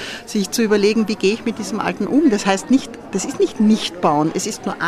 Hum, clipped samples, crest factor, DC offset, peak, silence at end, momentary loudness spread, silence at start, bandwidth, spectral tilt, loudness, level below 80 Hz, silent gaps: none; under 0.1%; 16 dB; under 0.1%; -2 dBFS; 0 s; 8 LU; 0 s; 15 kHz; -4.5 dB/octave; -18 LUFS; -52 dBFS; none